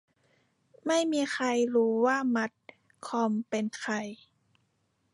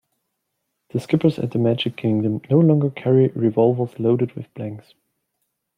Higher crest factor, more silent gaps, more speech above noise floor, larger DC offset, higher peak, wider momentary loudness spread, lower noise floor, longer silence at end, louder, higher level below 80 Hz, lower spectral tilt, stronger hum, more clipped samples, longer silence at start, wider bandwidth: about the same, 16 dB vs 18 dB; neither; second, 46 dB vs 57 dB; neither; second, -14 dBFS vs -4 dBFS; second, 10 LU vs 14 LU; about the same, -74 dBFS vs -76 dBFS; about the same, 1 s vs 1 s; second, -29 LUFS vs -20 LUFS; second, -82 dBFS vs -62 dBFS; second, -4 dB/octave vs -9 dB/octave; neither; neither; about the same, 0.85 s vs 0.95 s; about the same, 11.5 kHz vs 10.5 kHz